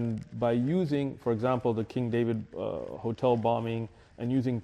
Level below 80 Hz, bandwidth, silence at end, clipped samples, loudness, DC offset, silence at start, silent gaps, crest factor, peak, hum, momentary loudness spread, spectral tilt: -62 dBFS; 9.6 kHz; 0 s; under 0.1%; -30 LUFS; under 0.1%; 0 s; none; 16 dB; -14 dBFS; none; 9 LU; -9 dB/octave